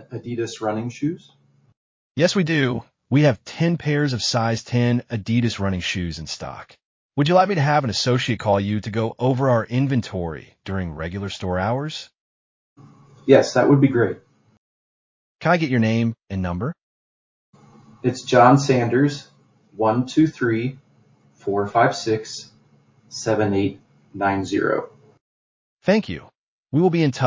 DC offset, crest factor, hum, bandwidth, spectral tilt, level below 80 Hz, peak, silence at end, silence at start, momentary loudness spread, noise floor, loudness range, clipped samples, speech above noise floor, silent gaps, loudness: under 0.1%; 22 dB; none; 7.6 kHz; -6 dB/octave; -48 dBFS; 0 dBFS; 0 s; 0 s; 14 LU; -57 dBFS; 5 LU; under 0.1%; 37 dB; 1.77-2.15 s, 6.85-7.09 s, 12.20-12.76 s, 14.58-15.39 s, 16.83-17.53 s, 25.21-25.77 s, 26.37-26.63 s; -21 LUFS